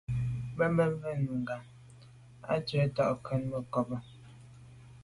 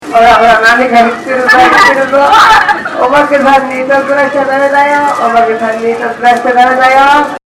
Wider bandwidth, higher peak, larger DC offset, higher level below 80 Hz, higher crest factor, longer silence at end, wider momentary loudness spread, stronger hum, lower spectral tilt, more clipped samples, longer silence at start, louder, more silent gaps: second, 11.5 kHz vs 16.5 kHz; second, -16 dBFS vs 0 dBFS; neither; second, -56 dBFS vs -40 dBFS; first, 18 dB vs 6 dB; second, 0 s vs 0.15 s; first, 24 LU vs 7 LU; neither; first, -8 dB/octave vs -3.5 dB/octave; second, under 0.1% vs 4%; about the same, 0.1 s vs 0 s; second, -33 LUFS vs -6 LUFS; neither